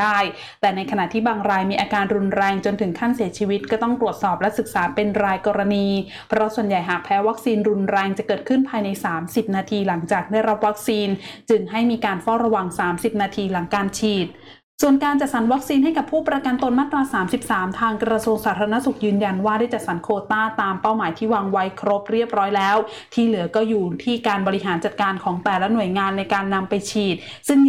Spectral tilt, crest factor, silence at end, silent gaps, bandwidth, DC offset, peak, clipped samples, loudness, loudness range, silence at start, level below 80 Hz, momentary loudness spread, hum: -5.5 dB/octave; 12 dB; 0 s; 14.63-14.78 s; 16 kHz; 0.1%; -8 dBFS; under 0.1%; -21 LUFS; 1 LU; 0 s; -56 dBFS; 4 LU; none